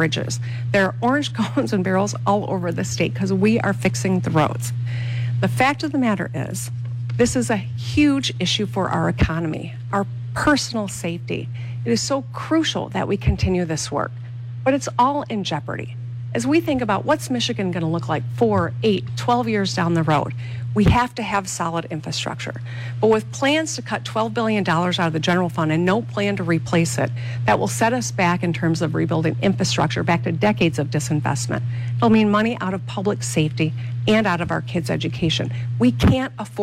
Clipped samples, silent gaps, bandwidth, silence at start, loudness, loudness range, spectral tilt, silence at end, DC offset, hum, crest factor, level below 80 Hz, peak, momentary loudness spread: under 0.1%; none; 15 kHz; 0 s; -21 LUFS; 2 LU; -5.5 dB/octave; 0 s; under 0.1%; none; 14 dB; -40 dBFS; -6 dBFS; 8 LU